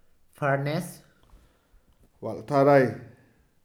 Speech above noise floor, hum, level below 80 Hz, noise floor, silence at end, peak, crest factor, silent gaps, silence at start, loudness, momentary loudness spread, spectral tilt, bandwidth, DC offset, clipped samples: 37 dB; none; -64 dBFS; -61 dBFS; 0.6 s; -6 dBFS; 20 dB; none; 0.4 s; -24 LUFS; 20 LU; -7 dB/octave; 16 kHz; under 0.1%; under 0.1%